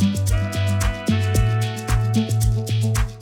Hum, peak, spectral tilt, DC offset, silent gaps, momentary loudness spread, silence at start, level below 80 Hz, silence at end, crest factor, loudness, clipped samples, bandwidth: none; -8 dBFS; -6 dB/octave; under 0.1%; none; 3 LU; 0 s; -28 dBFS; 0 s; 12 dB; -21 LUFS; under 0.1%; 17 kHz